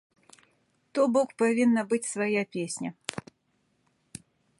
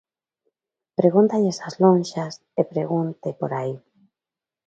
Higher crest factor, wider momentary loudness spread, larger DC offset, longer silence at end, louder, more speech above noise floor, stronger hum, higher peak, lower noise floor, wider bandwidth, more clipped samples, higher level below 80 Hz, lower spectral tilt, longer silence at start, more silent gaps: about the same, 22 dB vs 20 dB; first, 23 LU vs 12 LU; neither; first, 1.4 s vs 0.9 s; second, -27 LUFS vs -22 LUFS; second, 46 dB vs 69 dB; neither; second, -8 dBFS vs -2 dBFS; second, -72 dBFS vs -90 dBFS; first, 11.5 kHz vs 8.8 kHz; neither; about the same, -74 dBFS vs -70 dBFS; second, -4.5 dB/octave vs -7.5 dB/octave; about the same, 0.95 s vs 1 s; neither